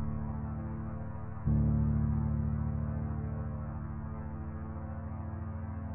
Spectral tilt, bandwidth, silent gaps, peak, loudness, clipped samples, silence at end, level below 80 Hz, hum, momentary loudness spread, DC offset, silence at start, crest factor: -13.5 dB/octave; 2.8 kHz; none; -20 dBFS; -36 LUFS; under 0.1%; 0 s; -42 dBFS; none; 11 LU; under 0.1%; 0 s; 14 dB